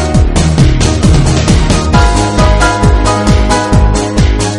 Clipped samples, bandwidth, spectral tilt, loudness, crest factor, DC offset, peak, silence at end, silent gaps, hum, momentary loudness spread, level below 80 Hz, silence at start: 0.5%; 11.5 kHz; -5.5 dB/octave; -9 LUFS; 8 dB; under 0.1%; 0 dBFS; 0 s; none; none; 2 LU; -12 dBFS; 0 s